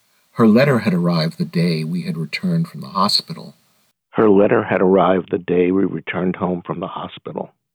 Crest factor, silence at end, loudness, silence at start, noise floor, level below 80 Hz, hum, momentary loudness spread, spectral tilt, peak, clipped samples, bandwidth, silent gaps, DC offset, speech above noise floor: 14 dB; 0.3 s; -18 LUFS; 0.35 s; -62 dBFS; -62 dBFS; none; 16 LU; -6.5 dB/octave; -4 dBFS; under 0.1%; 16 kHz; none; under 0.1%; 45 dB